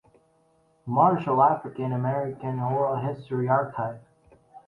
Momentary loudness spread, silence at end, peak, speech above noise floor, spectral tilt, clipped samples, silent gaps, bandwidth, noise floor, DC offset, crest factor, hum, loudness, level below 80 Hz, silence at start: 11 LU; 0.1 s; -6 dBFS; 40 dB; -10 dB/octave; under 0.1%; none; 4.3 kHz; -64 dBFS; under 0.1%; 20 dB; none; -25 LUFS; -66 dBFS; 0.85 s